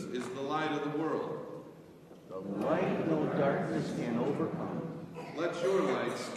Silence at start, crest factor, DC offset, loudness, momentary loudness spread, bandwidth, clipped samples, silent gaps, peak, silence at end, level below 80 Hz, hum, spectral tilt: 0 s; 16 dB; under 0.1%; -34 LUFS; 15 LU; 13.5 kHz; under 0.1%; none; -18 dBFS; 0 s; -72 dBFS; none; -6.5 dB/octave